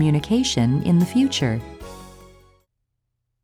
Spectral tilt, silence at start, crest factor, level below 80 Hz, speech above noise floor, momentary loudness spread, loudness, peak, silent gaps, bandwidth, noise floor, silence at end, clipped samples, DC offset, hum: -5.5 dB/octave; 0 s; 14 dB; -46 dBFS; 57 dB; 21 LU; -20 LUFS; -8 dBFS; none; 14.5 kHz; -76 dBFS; 1.35 s; under 0.1%; under 0.1%; none